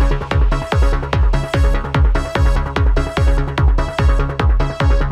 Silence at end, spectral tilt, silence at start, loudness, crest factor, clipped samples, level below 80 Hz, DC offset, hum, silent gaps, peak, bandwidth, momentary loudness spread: 0 s; -7 dB/octave; 0 s; -17 LUFS; 12 dB; under 0.1%; -16 dBFS; under 0.1%; none; none; -2 dBFS; 10.5 kHz; 1 LU